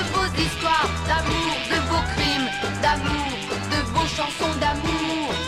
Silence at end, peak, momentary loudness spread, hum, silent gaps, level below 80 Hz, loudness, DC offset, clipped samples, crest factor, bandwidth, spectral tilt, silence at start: 0 s; -8 dBFS; 3 LU; none; none; -36 dBFS; -23 LUFS; under 0.1%; under 0.1%; 16 dB; 15 kHz; -4 dB/octave; 0 s